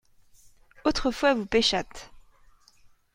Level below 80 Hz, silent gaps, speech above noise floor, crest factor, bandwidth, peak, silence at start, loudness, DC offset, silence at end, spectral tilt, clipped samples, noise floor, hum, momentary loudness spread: -46 dBFS; none; 32 dB; 20 dB; 16 kHz; -8 dBFS; 0.85 s; -25 LUFS; under 0.1%; 0.95 s; -3.5 dB/octave; under 0.1%; -58 dBFS; none; 14 LU